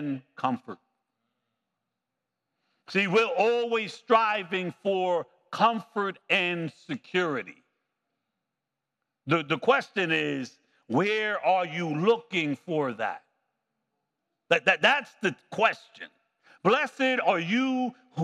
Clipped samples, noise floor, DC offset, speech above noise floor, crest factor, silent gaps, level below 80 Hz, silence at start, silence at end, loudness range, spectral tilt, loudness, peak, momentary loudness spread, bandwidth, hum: under 0.1%; -86 dBFS; under 0.1%; 59 dB; 22 dB; none; under -90 dBFS; 0 s; 0 s; 5 LU; -5.5 dB/octave; -26 LUFS; -6 dBFS; 12 LU; 11.5 kHz; none